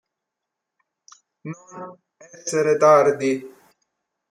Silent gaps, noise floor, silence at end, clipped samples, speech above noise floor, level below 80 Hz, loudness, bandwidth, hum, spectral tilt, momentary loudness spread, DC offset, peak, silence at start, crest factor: none; -83 dBFS; 0.8 s; under 0.1%; 63 dB; -74 dBFS; -18 LUFS; 12.5 kHz; none; -5 dB/octave; 24 LU; under 0.1%; -4 dBFS; 1.45 s; 20 dB